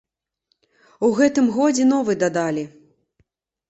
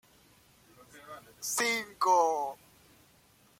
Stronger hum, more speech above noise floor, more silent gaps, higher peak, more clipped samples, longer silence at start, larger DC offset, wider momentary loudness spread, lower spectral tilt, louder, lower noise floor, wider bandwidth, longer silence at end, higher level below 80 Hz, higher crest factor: neither; first, 53 dB vs 34 dB; neither; first, -4 dBFS vs -14 dBFS; neither; about the same, 1 s vs 0.95 s; neither; second, 8 LU vs 23 LU; first, -5 dB/octave vs -1 dB/octave; first, -19 LUFS vs -29 LUFS; first, -72 dBFS vs -63 dBFS; second, 8.2 kHz vs 16.5 kHz; about the same, 1 s vs 1.05 s; first, -64 dBFS vs -74 dBFS; about the same, 16 dB vs 20 dB